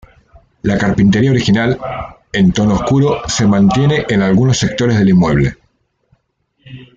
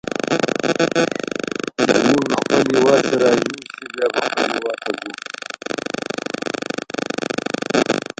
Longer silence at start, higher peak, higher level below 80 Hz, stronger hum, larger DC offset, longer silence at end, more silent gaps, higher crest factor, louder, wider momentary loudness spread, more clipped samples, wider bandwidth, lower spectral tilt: first, 0.65 s vs 0.05 s; about the same, -2 dBFS vs 0 dBFS; first, -36 dBFS vs -58 dBFS; neither; neither; about the same, 0.15 s vs 0.2 s; neither; second, 12 dB vs 20 dB; first, -13 LUFS vs -20 LUFS; second, 8 LU vs 11 LU; neither; second, 7.8 kHz vs 9.2 kHz; first, -6 dB/octave vs -4 dB/octave